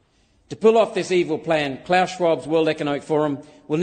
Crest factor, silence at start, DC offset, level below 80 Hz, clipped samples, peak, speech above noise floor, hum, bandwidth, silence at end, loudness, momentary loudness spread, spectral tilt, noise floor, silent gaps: 16 dB; 0.5 s; under 0.1%; -60 dBFS; under 0.1%; -4 dBFS; 40 dB; none; 9.6 kHz; 0 s; -21 LUFS; 8 LU; -5.5 dB/octave; -60 dBFS; none